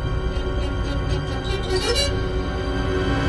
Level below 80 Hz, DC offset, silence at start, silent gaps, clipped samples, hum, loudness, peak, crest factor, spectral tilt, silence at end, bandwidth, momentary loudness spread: -26 dBFS; under 0.1%; 0 s; none; under 0.1%; none; -24 LUFS; -8 dBFS; 14 dB; -5 dB/octave; 0 s; 12 kHz; 5 LU